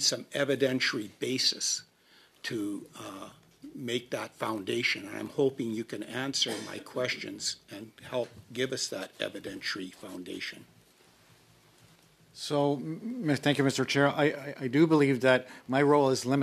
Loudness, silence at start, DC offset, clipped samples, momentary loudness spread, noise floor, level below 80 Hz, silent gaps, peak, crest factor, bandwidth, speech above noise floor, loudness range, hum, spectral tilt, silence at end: -30 LUFS; 0 s; under 0.1%; under 0.1%; 16 LU; -62 dBFS; -76 dBFS; none; -8 dBFS; 24 dB; 14.5 kHz; 32 dB; 10 LU; none; -4 dB/octave; 0 s